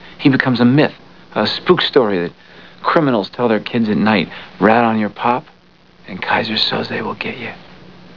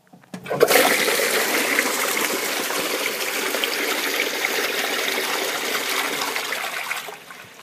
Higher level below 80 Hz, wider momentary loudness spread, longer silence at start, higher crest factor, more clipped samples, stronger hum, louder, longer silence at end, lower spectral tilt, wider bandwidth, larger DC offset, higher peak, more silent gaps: first, -54 dBFS vs -70 dBFS; first, 13 LU vs 10 LU; second, 0 s vs 0.35 s; second, 16 dB vs 22 dB; neither; neither; first, -16 LUFS vs -21 LUFS; first, 0.4 s vs 0 s; first, -7.5 dB/octave vs -0.5 dB/octave; second, 5.4 kHz vs 15.5 kHz; first, 0.5% vs under 0.1%; about the same, 0 dBFS vs 0 dBFS; neither